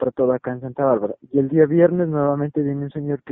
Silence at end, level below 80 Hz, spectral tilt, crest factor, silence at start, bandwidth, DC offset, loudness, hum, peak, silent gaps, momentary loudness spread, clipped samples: 0 s; -58 dBFS; -10 dB/octave; 18 dB; 0 s; 3.7 kHz; under 0.1%; -20 LUFS; none; -2 dBFS; none; 10 LU; under 0.1%